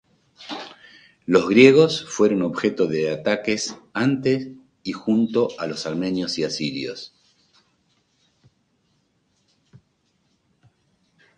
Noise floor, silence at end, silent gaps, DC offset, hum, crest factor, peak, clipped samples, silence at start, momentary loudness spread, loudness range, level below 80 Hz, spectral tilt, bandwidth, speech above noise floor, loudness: -68 dBFS; 4.3 s; none; under 0.1%; none; 22 dB; 0 dBFS; under 0.1%; 0.4 s; 20 LU; 12 LU; -64 dBFS; -5 dB/octave; 9.6 kHz; 48 dB; -21 LUFS